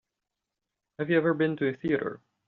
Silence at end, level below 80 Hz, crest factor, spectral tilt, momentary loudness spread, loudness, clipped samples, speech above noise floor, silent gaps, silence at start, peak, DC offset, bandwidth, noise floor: 0.3 s; -68 dBFS; 18 dB; -6 dB/octave; 10 LU; -28 LUFS; under 0.1%; 60 dB; none; 1 s; -10 dBFS; under 0.1%; 4.4 kHz; -87 dBFS